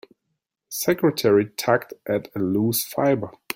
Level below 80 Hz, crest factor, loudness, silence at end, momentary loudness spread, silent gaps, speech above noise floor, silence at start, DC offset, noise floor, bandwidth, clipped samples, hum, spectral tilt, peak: -62 dBFS; 20 dB; -22 LUFS; 0.25 s; 7 LU; none; 57 dB; 0.7 s; under 0.1%; -78 dBFS; 17 kHz; under 0.1%; none; -5 dB/octave; -4 dBFS